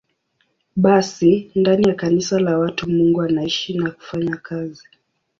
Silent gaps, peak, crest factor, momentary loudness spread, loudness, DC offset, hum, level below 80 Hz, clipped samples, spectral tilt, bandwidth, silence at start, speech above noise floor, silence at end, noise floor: none; -2 dBFS; 16 dB; 11 LU; -18 LUFS; under 0.1%; none; -54 dBFS; under 0.1%; -6 dB/octave; 7.6 kHz; 0.75 s; 49 dB; 0.65 s; -67 dBFS